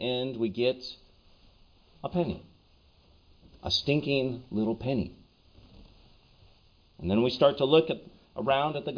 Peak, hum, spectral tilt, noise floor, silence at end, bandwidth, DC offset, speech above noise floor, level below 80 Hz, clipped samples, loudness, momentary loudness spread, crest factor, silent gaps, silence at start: -10 dBFS; none; -6.5 dB/octave; -61 dBFS; 0 s; 5.4 kHz; under 0.1%; 34 dB; -56 dBFS; under 0.1%; -28 LUFS; 17 LU; 22 dB; none; 0 s